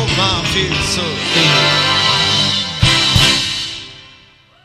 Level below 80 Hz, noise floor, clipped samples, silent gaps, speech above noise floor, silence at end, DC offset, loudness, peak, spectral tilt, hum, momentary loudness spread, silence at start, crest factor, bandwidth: -32 dBFS; -46 dBFS; under 0.1%; none; 32 dB; 0.55 s; under 0.1%; -12 LUFS; 0 dBFS; -3 dB/octave; none; 9 LU; 0 s; 16 dB; 15 kHz